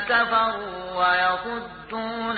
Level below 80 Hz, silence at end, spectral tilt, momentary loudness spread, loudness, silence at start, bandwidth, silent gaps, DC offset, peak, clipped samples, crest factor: -54 dBFS; 0 s; -8 dB/octave; 12 LU; -23 LUFS; 0 s; 4.8 kHz; none; under 0.1%; -10 dBFS; under 0.1%; 14 dB